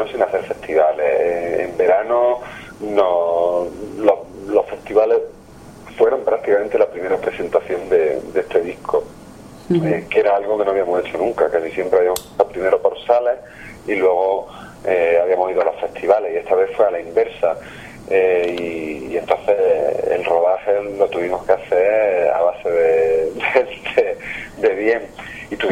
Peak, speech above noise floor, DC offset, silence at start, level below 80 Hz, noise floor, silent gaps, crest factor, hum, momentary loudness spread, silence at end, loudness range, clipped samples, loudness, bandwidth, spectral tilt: 0 dBFS; 23 dB; under 0.1%; 0 s; -50 dBFS; -40 dBFS; none; 18 dB; none; 8 LU; 0 s; 2 LU; under 0.1%; -18 LUFS; 14.5 kHz; -5.5 dB/octave